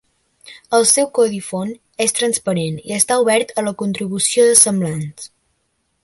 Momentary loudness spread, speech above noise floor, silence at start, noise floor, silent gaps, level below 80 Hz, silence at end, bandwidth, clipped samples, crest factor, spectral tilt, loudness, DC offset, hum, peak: 15 LU; 51 dB; 0.45 s; -68 dBFS; none; -60 dBFS; 0.75 s; 16 kHz; under 0.1%; 18 dB; -3 dB/octave; -16 LUFS; under 0.1%; none; 0 dBFS